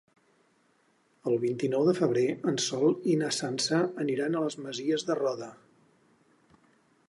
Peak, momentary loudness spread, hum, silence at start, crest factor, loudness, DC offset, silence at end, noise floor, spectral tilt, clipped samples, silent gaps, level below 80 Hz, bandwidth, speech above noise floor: -12 dBFS; 7 LU; none; 1.25 s; 18 dB; -29 LUFS; under 0.1%; 1.55 s; -68 dBFS; -4.5 dB/octave; under 0.1%; none; -78 dBFS; 11.5 kHz; 40 dB